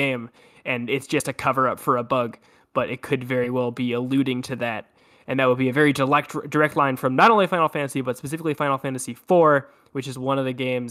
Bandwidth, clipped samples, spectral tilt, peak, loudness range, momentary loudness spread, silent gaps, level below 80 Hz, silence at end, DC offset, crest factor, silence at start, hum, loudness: 15.5 kHz; under 0.1%; -5.5 dB/octave; -6 dBFS; 5 LU; 12 LU; none; -64 dBFS; 0 s; under 0.1%; 18 dB; 0 s; none; -22 LUFS